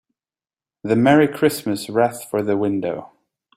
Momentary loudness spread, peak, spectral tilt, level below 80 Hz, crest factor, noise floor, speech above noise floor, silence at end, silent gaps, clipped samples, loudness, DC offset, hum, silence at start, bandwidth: 12 LU; -2 dBFS; -6 dB/octave; -60 dBFS; 18 dB; under -90 dBFS; over 72 dB; 0.5 s; none; under 0.1%; -19 LUFS; under 0.1%; none; 0.85 s; 16 kHz